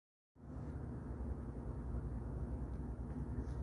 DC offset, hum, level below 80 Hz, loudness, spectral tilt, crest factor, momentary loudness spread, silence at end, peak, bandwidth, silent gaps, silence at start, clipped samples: under 0.1%; none; -46 dBFS; -46 LUFS; -10 dB/octave; 12 dB; 4 LU; 0 s; -32 dBFS; 10.5 kHz; none; 0.35 s; under 0.1%